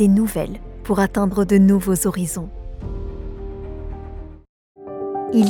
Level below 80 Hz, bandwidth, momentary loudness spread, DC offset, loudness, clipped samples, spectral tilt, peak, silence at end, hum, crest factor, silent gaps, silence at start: -34 dBFS; 17.5 kHz; 20 LU; under 0.1%; -19 LUFS; under 0.1%; -6.5 dB/octave; -4 dBFS; 0 s; none; 16 dB; 4.49-4.75 s; 0 s